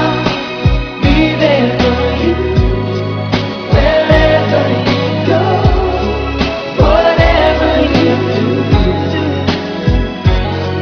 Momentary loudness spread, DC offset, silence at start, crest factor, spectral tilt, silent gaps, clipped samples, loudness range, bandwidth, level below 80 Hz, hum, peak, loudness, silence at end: 7 LU; under 0.1%; 0 s; 12 dB; -7 dB/octave; none; 0.2%; 1 LU; 5.4 kHz; -20 dBFS; none; 0 dBFS; -12 LUFS; 0 s